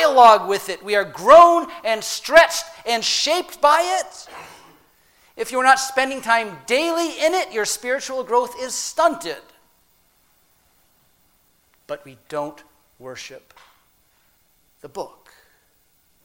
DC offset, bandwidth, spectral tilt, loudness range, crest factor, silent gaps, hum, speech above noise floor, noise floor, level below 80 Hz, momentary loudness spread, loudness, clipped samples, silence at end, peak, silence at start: under 0.1%; 16.5 kHz; -1.5 dB/octave; 21 LU; 20 dB; none; none; 43 dB; -61 dBFS; -58 dBFS; 23 LU; -17 LUFS; under 0.1%; 1.15 s; 0 dBFS; 0 s